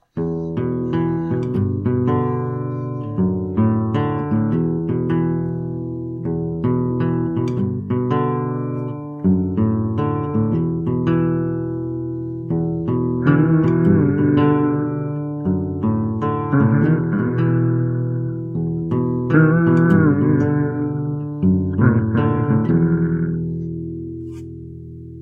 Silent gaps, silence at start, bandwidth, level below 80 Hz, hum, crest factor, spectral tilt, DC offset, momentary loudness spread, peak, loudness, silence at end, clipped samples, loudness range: none; 0.15 s; 3.7 kHz; -46 dBFS; none; 18 dB; -11 dB/octave; under 0.1%; 10 LU; -2 dBFS; -19 LUFS; 0 s; under 0.1%; 4 LU